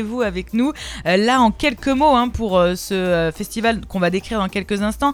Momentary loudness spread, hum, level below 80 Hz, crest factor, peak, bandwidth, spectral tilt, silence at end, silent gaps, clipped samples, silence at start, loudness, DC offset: 7 LU; none; -38 dBFS; 16 dB; -2 dBFS; 19 kHz; -5 dB/octave; 0 s; none; under 0.1%; 0 s; -19 LUFS; under 0.1%